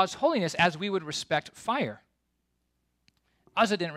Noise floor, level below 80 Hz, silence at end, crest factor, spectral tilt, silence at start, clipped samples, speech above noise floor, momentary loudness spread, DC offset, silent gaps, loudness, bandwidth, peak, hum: -77 dBFS; -68 dBFS; 0 s; 20 dB; -4 dB/octave; 0 s; under 0.1%; 49 dB; 6 LU; under 0.1%; none; -28 LUFS; 14.5 kHz; -10 dBFS; none